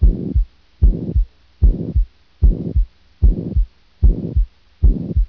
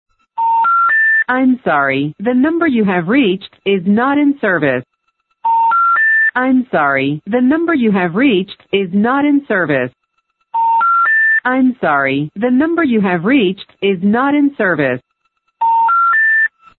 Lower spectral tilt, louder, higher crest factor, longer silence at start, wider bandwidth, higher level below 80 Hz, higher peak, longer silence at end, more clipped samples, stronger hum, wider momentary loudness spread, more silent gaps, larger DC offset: first, -12 dB/octave vs -10.5 dB/octave; second, -21 LUFS vs -13 LUFS; about the same, 14 dB vs 12 dB; second, 0 s vs 0.35 s; second, 1 kHz vs 4.3 kHz; first, -16 dBFS vs -58 dBFS; about the same, -2 dBFS vs -2 dBFS; second, 0 s vs 0.3 s; neither; neither; about the same, 10 LU vs 8 LU; neither; first, 0.2% vs under 0.1%